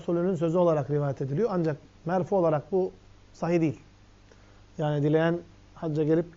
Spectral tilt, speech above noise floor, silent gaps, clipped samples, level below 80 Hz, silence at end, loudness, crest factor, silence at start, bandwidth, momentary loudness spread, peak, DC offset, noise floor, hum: -8 dB/octave; 28 dB; none; under 0.1%; -58 dBFS; 0.05 s; -27 LUFS; 16 dB; 0 s; 7.6 kHz; 10 LU; -12 dBFS; under 0.1%; -54 dBFS; 50 Hz at -55 dBFS